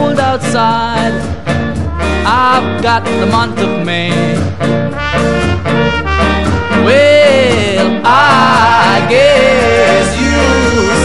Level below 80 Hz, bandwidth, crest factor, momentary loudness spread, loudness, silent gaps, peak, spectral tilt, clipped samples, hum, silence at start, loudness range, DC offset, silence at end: -26 dBFS; 12 kHz; 10 dB; 8 LU; -10 LUFS; none; 0 dBFS; -5 dB/octave; 0.3%; none; 0 s; 5 LU; 4%; 0 s